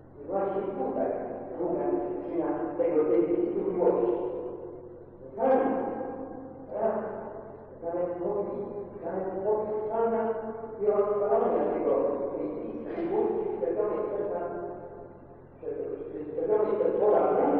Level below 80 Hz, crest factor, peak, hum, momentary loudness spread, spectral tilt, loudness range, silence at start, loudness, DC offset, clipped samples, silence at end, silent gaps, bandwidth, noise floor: -64 dBFS; 16 dB; -12 dBFS; none; 14 LU; -8 dB/octave; 5 LU; 0 s; -29 LUFS; under 0.1%; under 0.1%; 0 s; none; 3.6 kHz; -49 dBFS